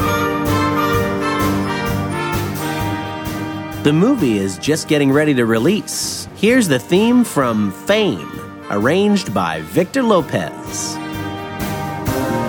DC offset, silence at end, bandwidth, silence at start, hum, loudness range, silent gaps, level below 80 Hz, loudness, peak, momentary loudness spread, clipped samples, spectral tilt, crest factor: under 0.1%; 0 s; over 20 kHz; 0 s; none; 4 LU; none; -40 dBFS; -17 LUFS; 0 dBFS; 10 LU; under 0.1%; -5 dB/octave; 16 dB